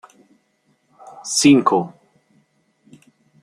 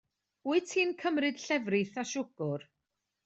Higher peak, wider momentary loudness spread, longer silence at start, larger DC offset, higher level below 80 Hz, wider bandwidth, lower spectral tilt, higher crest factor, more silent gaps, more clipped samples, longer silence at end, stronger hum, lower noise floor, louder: first, -2 dBFS vs -16 dBFS; first, 21 LU vs 7 LU; first, 1.25 s vs 0.45 s; neither; first, -66 dBFS vs -80 dBFS; first, 15 kHz vs 8.2 kHz; about the same, -4 dB/octave vs -4.5 dB/octave; about the same, 20 dB vs 16 dB; neither; neither; first, 1.55 s vs 0.65 s; neither; second, -64 dBFS vs -85 dBFS; first, -15 LUFS vs -32 LUFS